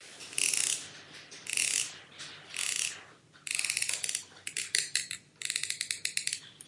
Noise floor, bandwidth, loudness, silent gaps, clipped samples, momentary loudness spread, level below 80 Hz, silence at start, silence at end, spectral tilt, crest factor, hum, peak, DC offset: -55 dBFS; 11.5 kHz; -31 LUFS; none; under 0.1%; 17 LU; -82 dBFS; 0 s; 0 s; 2 dB/octave; 28 dB; none; -8 dBFS; under 0.1%